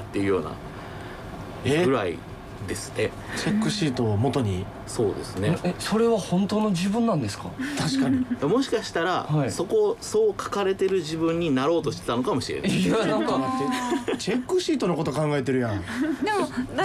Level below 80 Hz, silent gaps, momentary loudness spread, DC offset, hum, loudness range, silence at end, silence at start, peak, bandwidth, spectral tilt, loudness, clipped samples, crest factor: -50 dBFS; none; 9 LU; under 0.1%; none; 3 LU; 0 s; 0 s; -12 dBFS; 15 kHz; -5.5 dB/octave; -25 LUFS; under 0.1%; 12 dB